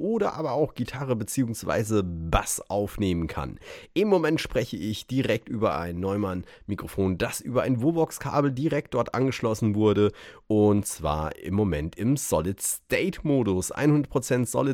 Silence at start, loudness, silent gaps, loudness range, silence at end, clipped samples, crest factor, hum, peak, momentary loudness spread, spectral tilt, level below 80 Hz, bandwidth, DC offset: 0 s; -26 LUFS; none; 3 LU; 0 s; under 0.1%; 18 dB; none; -6 dBFS; 7 LU; -5.5 dB/octave; -44 dBFS; 18 kHz; under 0.1%